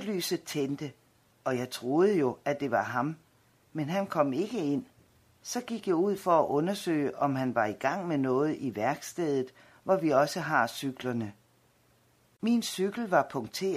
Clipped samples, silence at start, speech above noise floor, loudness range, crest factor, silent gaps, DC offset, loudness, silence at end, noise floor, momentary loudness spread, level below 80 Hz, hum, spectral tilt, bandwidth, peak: under 0.1%; 0 s; 37 dB; 3 LU; 20 dB; none; under 0.1%; -30 LUFS; 0 s; -66 dBFS; 11 LU; -74 dBFS; none; -5.5 dB/octave; 15.5 kHz; -10 dBFS